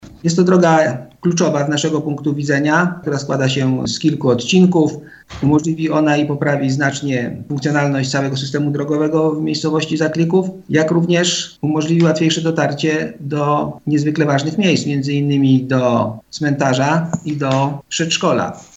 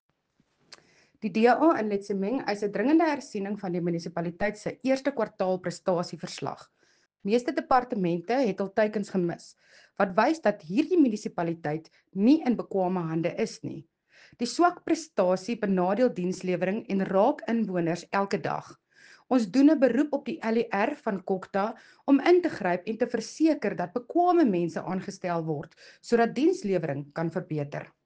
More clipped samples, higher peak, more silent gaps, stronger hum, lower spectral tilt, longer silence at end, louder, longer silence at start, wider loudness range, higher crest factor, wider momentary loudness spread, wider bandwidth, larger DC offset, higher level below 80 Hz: neither; first, 0 dBFS vs -6 dBFS; neither; neither; about the same, -5.5 dB/octave vs -6.5 dB/octave; about the same, 0.15 s vs 0.2 s; first, -16 LUFS vs -27 LUFS; second, 0.05 s vs 1.25 s; about the same, 2 LU vs 3 LU; about the same, 16 dB vs 20 dB; second, 6 LU vs 11 LU; second, 8.2 kHz vs 9.4 kHz; neither; first, -52 dBFS vs -66 dBFS